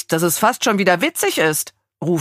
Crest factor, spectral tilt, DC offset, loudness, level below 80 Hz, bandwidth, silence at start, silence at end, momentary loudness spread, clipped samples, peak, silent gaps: 18 dB; -3.5 dB/octave; under 0.1%; -17 LUFS; -64 dBFS; 15.5 kHz; 0.1 s; 0 s; 8 LU; under 0.1%; 0 dBFS; none